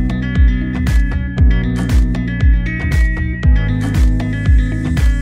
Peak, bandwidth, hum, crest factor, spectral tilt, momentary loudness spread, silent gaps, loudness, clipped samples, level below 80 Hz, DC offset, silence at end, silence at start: -2 dBFS; 9.8 kHz; none; 12 dB; -7.5 dB/octave; 3 LU; none; -16 LUFS; under 0.1%; -14 dBFS; under 0.1%; 0 s; 0 s